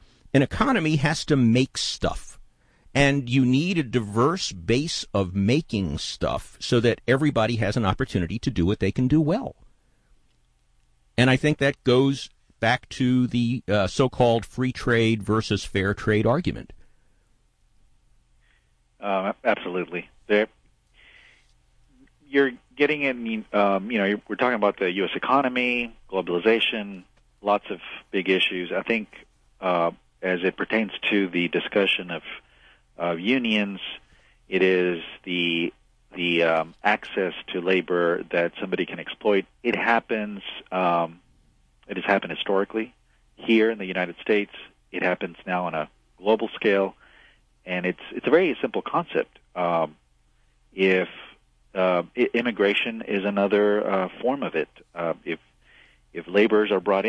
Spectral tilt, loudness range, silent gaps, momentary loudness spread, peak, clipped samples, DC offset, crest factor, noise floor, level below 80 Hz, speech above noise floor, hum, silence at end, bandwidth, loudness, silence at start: -5.5 dB/octave; 4 LU; none; 11 LU; -4 dBFS; under 0.1%; under 0.1%; 20 dB; -63 dBFS; -48 dBFS; 40 dB; none; 0 s; 11 kHz; -24 LUFS; 0.35 s